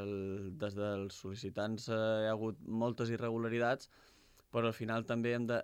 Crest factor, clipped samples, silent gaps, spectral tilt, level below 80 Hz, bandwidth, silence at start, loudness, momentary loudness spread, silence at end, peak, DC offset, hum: 16 dB; under 0.1%; none; -6.5 dB/octave; -74 dBFS; 15.5 kHz; 0 s; -38 LUFS; 7 LU; 0 s; -22 dBFS; under 0.1%; none